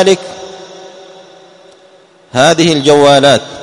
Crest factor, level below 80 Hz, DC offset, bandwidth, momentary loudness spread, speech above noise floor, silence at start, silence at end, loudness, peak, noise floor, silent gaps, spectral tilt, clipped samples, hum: 12 dB; -50 dBFS; under 0.1%; 13 kHz; 23 LU; 35 dB; 0 s; 0 s; -8 LUFS; 0 dBFS; -43 dBFS; none; -4 dB/octave; 0.7%; none